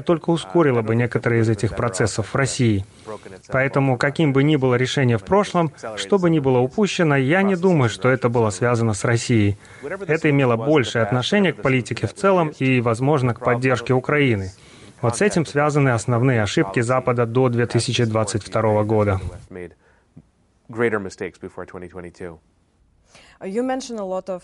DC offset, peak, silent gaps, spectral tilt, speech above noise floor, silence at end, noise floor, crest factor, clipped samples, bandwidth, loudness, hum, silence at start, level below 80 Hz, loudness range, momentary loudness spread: under 0.1%; -6 dBFS; none; -6 dB/octave; 40 dB; 0.05 s; -59 dBFS; 14 dB; under 0.1%; 11.5 kHz; -19 LUFS; none; 0 s; -50 dBFS; 10 LU; 15 LU